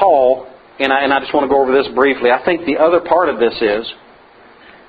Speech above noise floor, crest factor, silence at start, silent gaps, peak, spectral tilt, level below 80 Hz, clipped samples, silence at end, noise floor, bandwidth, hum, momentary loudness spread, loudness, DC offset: 30 dB; 14 dB; 0 s; none; 0 dBFS; -6.5 dB/octave; -50 dBFS; under 0.1%; 0.95 s; -44 dBFS; 5 kHz; none; 6 LU; -14 LUFS; under 0.1%